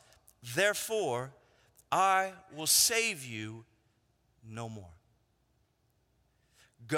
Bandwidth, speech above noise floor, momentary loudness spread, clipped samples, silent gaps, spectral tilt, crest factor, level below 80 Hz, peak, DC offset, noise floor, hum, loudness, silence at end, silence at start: 17 kHz; 42 dB; 23 LU; under 0.1%; none; -1.5 dB/octave; 22 dB; -74 dBFS; -12 dBFS; under 0.1%; -74 dBFS; none; -29 LUFS; 0 s; 0.45 s